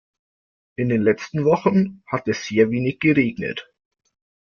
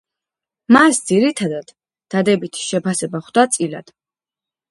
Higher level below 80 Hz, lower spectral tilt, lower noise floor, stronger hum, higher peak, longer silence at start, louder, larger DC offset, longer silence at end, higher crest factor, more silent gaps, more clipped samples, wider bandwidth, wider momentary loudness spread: about the same, -58 dBFS vs -62 dBFS; first, -7 dB/octave vs -4 dB/octave; about the same, under -90 dBFS vs -90 dBFS; neither; second, -4 dBFS vs 0 dBFS; about the same, 0.8 s vs 0.7 s; second, -21 LUFS vs -17 LUFS; neither; about the same, 0.85 s vs 0.9 s; about the same, 18 dB vs 18 dB; neither; neither; second, 7 kHz vs 11.5 kHz; about the same, 10 LU vs 12 LU